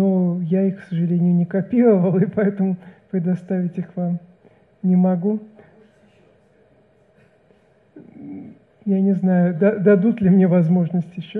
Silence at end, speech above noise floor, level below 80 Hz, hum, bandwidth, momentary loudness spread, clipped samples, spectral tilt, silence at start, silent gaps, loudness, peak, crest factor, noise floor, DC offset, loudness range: 0 s; 38 dB; -62 dBFS; none; 3.5 kHz; 13 LU; under 0.1%; -11.5 dB/octave; 0 s; none; -19 LUFS; -4 dBFS; 16 dB; -56 dBFS; under 0.1%; 8 LU